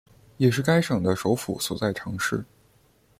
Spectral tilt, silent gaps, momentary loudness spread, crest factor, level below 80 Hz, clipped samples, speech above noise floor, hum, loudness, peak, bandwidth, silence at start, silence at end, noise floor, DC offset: -5.5 dB/octave; none; 6 LU; 18 dB; -56 dBFS; under 0.1%; 37 dB; none; -25 LUFS; -8 dBFS; 16 kHz; 0.4 s; 0.75 s; -61 dBFS; under 0.1%